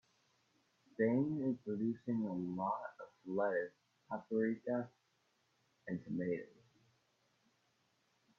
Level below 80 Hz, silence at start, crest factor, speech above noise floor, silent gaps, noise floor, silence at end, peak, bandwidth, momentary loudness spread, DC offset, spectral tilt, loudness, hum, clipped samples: -82 dBFS; 1 s; 20 dB; 40 dB; none; -79 dBFS; 1.9 s; -22 dBFS; 6.8 kHz; 15 LU; under 0.1%; -8.5 dB/octave; -40 LUFS; none; under 0.1%